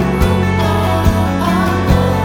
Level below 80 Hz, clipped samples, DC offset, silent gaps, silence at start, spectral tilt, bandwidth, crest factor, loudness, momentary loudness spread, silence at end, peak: -22 dBFS; under 0.1%; under 0.1%; none; 0 s; -6.5 dB/octave; 18 kHz; 12 dB; -14 LUFS; 1 LU; 0 s; 0 dBFS